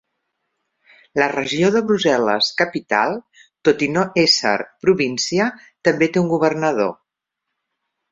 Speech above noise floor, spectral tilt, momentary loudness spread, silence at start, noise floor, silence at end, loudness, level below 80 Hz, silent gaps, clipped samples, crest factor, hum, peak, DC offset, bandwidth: 63 dB; -4 dB/octave; 5 LU; 1.15 s; -80 dBFS; 1.2 s; -18 LUFS; -60 dBFS; none; under 0.1%; 18 dB; none; -2 dBFS; under 0.1%; 7.8 kHz